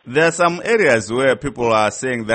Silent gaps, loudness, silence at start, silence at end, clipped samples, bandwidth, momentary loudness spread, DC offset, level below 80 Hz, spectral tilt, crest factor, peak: none; -16 LUFS; 0.05 s; 0 s; under 0.1%; 8.8 kHz; 5 LU; under 0.1%; -48 dBFS; -4.5 dB/octave; 14 dB; -2 dBFS